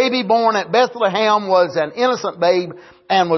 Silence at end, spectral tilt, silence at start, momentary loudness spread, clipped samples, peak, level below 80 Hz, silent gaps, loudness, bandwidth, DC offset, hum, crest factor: 0 s; -4.5 dB/octave; 0 s; 4 LU; under 0.1%; -4 dBFS; -66 dBFS; none; -17 LUFS; 6.2 kHz; under 0.1%; none; 14 dB